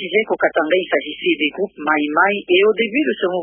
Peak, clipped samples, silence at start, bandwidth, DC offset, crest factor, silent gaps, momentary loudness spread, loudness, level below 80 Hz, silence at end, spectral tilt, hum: -2 dBFS; under 0.1%; 0 s; 3.5 kHz; under 0.1%; 16 dB; none; 5 LU; -17 LUFS; -64 dBFS; 0 s; -9.5 dB/octave; none